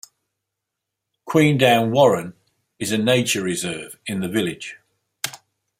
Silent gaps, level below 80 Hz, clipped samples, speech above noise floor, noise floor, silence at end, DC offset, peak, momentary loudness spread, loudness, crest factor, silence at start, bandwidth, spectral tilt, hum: none; -62 dBFS; under 0.1%; 63 dB; -82 dBFS; 0.45 s; under 0.1%; -2 dBFS; 15 LU; -20 LUFS; 20 dB; 1.25 s; 16 kHz; -4.5 dB/octave; none